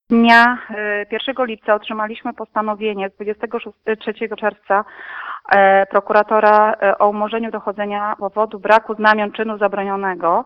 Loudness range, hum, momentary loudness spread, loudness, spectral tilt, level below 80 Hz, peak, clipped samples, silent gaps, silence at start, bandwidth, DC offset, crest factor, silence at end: 7 LU; none; 13 LU; -17 LUFS; -6 dB/octave; -60 dBFS; 0 dBFS; under 0.1%; none; 0.1 s; 8.8 kHz; under 0.1%; 16 dB; 0 s